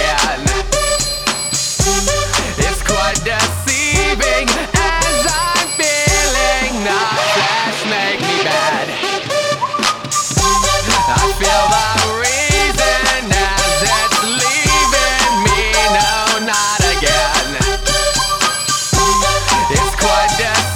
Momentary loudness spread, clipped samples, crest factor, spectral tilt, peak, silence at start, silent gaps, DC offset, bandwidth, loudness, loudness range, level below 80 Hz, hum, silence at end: 4 LU; under 0.1%; 14 dB; -2 dB/octave; 0 dBFS; 0 s; none; under 0.1%; 18 kHz; -13 LUFS; 3 LU; -26 dBFS; none; 0 s